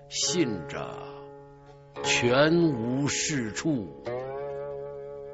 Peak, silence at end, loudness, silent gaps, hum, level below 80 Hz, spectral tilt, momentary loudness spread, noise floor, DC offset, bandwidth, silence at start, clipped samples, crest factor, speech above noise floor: -10 dBFS; 0 s; -27 LUFS; none; none; -58 dBFS; -4 dB/octave; 19 LU; -50 dBFS; under 0.1%; 8.2 kHz; 0 s; under 0.1%; 20 dB; 24 dB